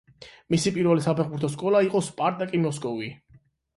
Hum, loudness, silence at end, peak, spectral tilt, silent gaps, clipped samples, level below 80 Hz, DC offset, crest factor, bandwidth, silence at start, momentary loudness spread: none; -25 LUFS; 0.6 s; -10 dBFS; -6 dB/octave; none; under 0.1%; -62 dBFS; under 0.1%; 16 dB; 11.5 kHz; 0.2 s; 9 LU